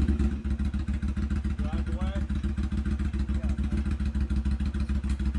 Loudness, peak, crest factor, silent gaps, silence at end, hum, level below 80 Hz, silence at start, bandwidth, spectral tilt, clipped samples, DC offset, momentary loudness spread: -30 LUFS; -14 dBFS; 14 dB; none; 0 s; none; -30 dBFS; 0 s; 9.8 kHz; -8 dB/octave; under 0.1%; under 0.1%; 2 LU